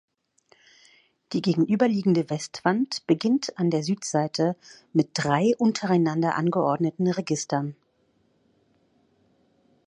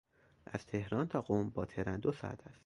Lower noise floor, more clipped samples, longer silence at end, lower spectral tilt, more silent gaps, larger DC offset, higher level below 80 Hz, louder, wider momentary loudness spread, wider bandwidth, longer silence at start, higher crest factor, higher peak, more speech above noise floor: first, -67 dBFS vs -59 dBFS; neither; first, 2.15 s vs 0.15 s; second, -6 dB/octave vs -8 dB/octave; neither; neither; second, -70 dBFS vs -60 dBFS; first, -25 LUFS vs -38 LUFS; second, 6 LU vs 11 LU; about the same, 11 kHz vs 11.5 kHz; first, 1.3 s vs 0.5 s; about the same, 20 dB vs 20 dB; first, -6 dBFS vs -20 dBFS; first, 43 dB vs 21 dB